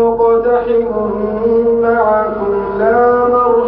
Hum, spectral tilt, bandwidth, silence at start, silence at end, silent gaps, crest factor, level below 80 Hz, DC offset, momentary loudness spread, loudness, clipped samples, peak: none; -12.5 dB/octave; 4 kHz; 0 s; 0 s; none; 10 dB; -38 dBFS; under 0.1%; 6 LU; -13 LUFS; under 0.1%; -2 dBFS